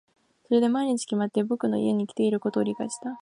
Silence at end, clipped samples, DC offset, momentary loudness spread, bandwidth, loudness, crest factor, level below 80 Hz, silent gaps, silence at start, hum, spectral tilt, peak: 0.05 s; under 0.1%; under 0.1%; 5 LU; 11 kHz; -26 LUFS; 16 dB; -74 dBFS; none; 0.5 s; none; -6 dB/octave; -10 dBFS